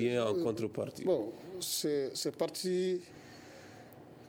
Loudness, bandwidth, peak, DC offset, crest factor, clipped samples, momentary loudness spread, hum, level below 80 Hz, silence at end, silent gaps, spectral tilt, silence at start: -35 LUFS; 17.5 kHz; -18 dBFS; under 0.1%; 16 dB; under 0.1%; 19 LU; none; -74 dBFS; 0 s; none; -4.5 dB/octave; 0 s